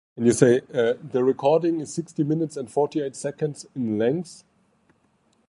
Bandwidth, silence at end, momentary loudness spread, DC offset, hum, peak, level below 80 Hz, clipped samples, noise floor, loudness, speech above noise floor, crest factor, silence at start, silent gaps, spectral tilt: 11.5 kHz; 1.15 s; 11 LU; under 0.1%; none; -2 dBFS; -66 dBFS; under 0.1%; -65 dBFS; -24 LUFS; 42 dB; 22 dB; 0.15 s; none; -6 dB/octave